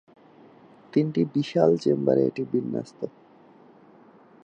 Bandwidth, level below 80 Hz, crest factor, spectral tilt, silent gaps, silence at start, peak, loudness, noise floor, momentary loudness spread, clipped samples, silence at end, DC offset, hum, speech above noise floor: 9 kHz; -74 dBFS; 20 dB; -8 dB/octave; none; 0.95 s; -6 dBFS; -24 LUFS; -53 dBFS; 13 LU; under 0.1%; 1.35 s; under 0.1%; none; 30 dB